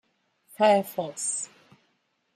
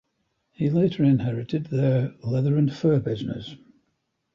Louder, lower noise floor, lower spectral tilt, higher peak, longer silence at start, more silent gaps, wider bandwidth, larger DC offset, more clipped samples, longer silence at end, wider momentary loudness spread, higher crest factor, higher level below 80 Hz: about the same, -25 LUFS vs -24 LUFS; about the same, -72 dBFS vs -75 dBFS; second, -3 dB/octave vs -9.5 dB/octave; about the same, -10 dBFS vs -10 dBFS; about the same, 0.6 s vs 0.6 s; neither; first, 15 kHz vs 7 kHz; neither; neither; about the same, 0.9 s vs 0.8 s; about the same, 11 LU vs 9 LU; first, 20 dB vs 14 dB; second, -84 dBFS vs -58 dBFS